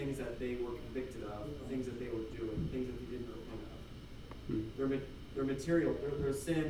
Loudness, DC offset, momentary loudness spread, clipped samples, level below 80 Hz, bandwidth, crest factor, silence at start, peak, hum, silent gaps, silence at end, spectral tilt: -39 LUFS; under 0.1%; 14 LU; under 0.1%; -52 dBFS; 16 kHz; 18 dB; 0 s; -20 dBFS; none; none; 0 s; -6.5 dB/octave